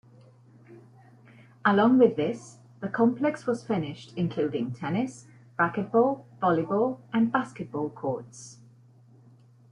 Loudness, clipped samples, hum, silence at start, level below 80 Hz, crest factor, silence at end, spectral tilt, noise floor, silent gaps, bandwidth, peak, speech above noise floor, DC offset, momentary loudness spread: -27 LUFS; under 0.1%; none; 0.7 s; -68 dBFS; 20 dB; 1.2 s; -7 dB/octave; -55 dBFS; none; 10.5 kHz; -8 dBFS; 29 dB; under 0.1%; 14 LU